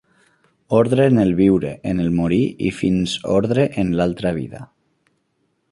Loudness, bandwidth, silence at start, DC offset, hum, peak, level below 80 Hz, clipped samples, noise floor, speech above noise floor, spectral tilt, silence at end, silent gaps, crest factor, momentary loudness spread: -18 LUFS; 11.5 kHz; 0.7 s; under 0.1%; none; -2 dBFS; -44 dBFS; under 0.1%; -68 dBFS; 50 dB; -7 dB/octave; 1.05 s; none; 16 dB; 9 LU